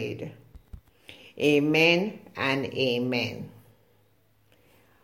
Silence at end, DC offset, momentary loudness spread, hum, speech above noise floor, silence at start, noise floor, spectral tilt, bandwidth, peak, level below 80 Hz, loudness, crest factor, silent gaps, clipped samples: 1.55 s; under 0.1%; 21 LU; none; 40 dB; 0 s; -65 dBFS; -5.5 dB/octave; 16.5 kHz; -8 dBFS; -58 dBFS; -25 LUFS; 22 dB; none; under 0.1%